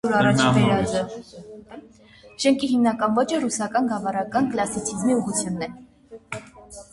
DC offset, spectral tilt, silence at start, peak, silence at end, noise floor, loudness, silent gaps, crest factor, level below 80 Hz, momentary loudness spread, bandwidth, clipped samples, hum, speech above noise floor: under 0.1%; -5 dB/octave; 0.05 s; -4 dBFS; 0.1 s; -50 dBFS; -22 LUFS; none; 20 dB; -52 dBFS; 22 LU; 11.5 kHz; under 0.1%; none; 28 dB